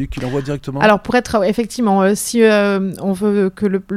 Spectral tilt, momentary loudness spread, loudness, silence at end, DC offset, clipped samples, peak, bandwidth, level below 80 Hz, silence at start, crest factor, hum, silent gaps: -5.5 dB/octave; 9 LU; -16 LUFS; 0 s; under 0.1%; under 0.1%; 0 dBFS; 15.5 kHz; -40 dBFS; 0 s; 16 dB; none; none